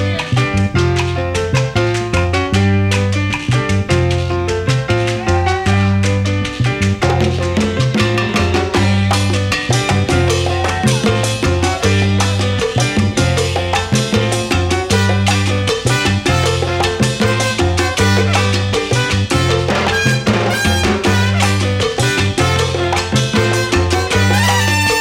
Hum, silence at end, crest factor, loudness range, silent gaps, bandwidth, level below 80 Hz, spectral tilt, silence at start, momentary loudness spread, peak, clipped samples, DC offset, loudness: none; 0 s; 14 dB; 1 LU; none; 16 kHz; -32 dBFS; -5 dB/octave; 0 s; 3 LU; 0 dBFS; under 0.1%; 0.1%; -15 LUFS